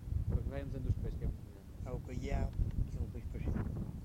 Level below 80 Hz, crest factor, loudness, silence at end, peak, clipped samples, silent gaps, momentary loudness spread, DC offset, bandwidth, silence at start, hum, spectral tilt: -40 dBFS; 16 dB; -40 LUFS; 0 s; -22 dBFS; under 0.1%; none; 7 LU; under 0.1%; 15.5 kHz; 0 s; none; -8.5 dB/octave